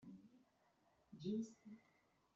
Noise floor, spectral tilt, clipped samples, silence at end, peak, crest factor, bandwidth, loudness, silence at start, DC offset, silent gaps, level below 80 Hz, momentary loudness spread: -79 dBFS; -8 dB/octave; under 0.1%; 0.55 s; -36 dBFS; 18 dB; 7.6 kHz; -48 LUFS; 0 s; under 0.1%; none; -88 dBFS; 19 LU